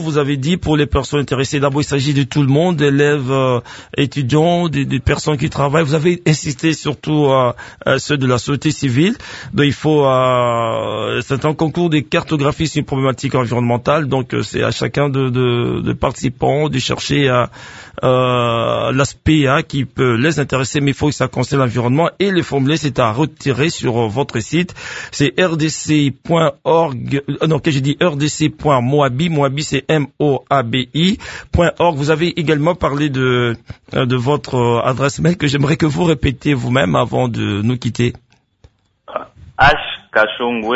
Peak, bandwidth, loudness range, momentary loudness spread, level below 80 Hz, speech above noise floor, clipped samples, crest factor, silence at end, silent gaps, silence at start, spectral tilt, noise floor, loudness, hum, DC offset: 0 dBFS; 8 kHz; 2 LU; 5 LU; -38 dBFS; 36 dB; under 0.1%; 16 dB; 0 s; none; 0 s; -6 dB/octave; -51 dBFS; -16 LUFS; none; under 0.1%